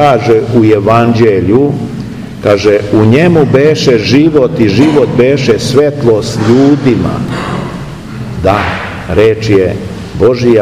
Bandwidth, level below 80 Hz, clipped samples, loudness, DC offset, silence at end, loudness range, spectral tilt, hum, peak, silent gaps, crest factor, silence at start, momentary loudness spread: 13.5 kHz; -34 dBFS; 4%; -8 LUFS; 0.4%; 0 s; 4 LU; -7 dB/octave; none; 0 dBFS; none; 8 dB; 0 s; 11 LU